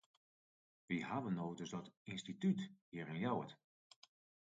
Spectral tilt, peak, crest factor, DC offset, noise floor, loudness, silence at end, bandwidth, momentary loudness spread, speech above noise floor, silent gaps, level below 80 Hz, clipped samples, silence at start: -6.5 dB/octave; -28 dBFS; 18 dB; under 0.1%; under -90 dBFS; -44 LUFS; 0.85 s; 7.8 kHz; 11 LU; over 47 dB; 1.97-2.05 s, 2.81-2.92 s; -80 dBFS; under 0.1%; 0.9 s